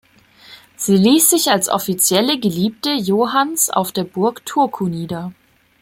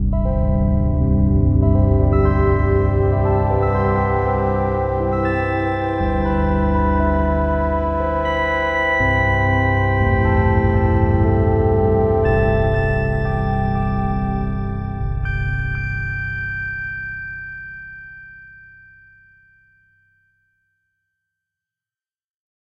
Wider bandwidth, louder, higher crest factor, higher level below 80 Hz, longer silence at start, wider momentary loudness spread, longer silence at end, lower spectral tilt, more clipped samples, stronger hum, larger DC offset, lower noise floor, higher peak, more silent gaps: first, 16.5 kHz vs 5.6 kHz; about the same, -16 LUFS vs -18 LUFS; about the same, 16 dB vs 14 dB; second, -58 dBFS vs -24 dBFS; first, 0.5 s vs 0 s; first, 12 LU vs 9 LU; second, 0.5 s vs 4.2 s; second, -3.5 dB/octave vs -9.5 dB/octave; neither; neither; neither; second, -46 dBFS vs under -90 dBFS; about the same, -2 dBFS vs -4 dBFS; neither